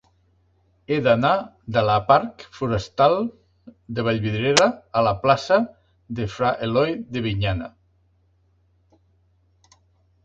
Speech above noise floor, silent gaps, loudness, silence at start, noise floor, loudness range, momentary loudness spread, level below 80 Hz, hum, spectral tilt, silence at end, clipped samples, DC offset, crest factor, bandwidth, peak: 42 dB; none; -21 LUFS; 0.9 s; -62 dBFS; 7 LU; 12 LU; -48 dBFS; none; -5 dB/octave; 2.55 s; under 0.1%; under 0.1%; 22 dB; 9.4 kHz; 0 dBFS